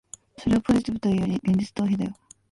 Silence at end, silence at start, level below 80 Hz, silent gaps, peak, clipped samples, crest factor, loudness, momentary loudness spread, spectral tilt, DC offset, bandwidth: 0.4 s; 0.4 s; -48 dBFS; none; -10 dBFS; under 0.1%; 16 dB; -25 LUFS; 10 LU; -7 dB/octave; under 0.1%; 11.5 kHz